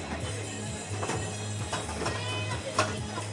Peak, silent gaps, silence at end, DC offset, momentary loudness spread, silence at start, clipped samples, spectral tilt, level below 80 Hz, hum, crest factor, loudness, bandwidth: -10 dBFS; none; 0 s; under 0.1%; 6 LU; 0 s; under 0.1%; -4 dB/octave; -52 dBFS; none; 22 dB; -33 LUFS; 11.5 kHz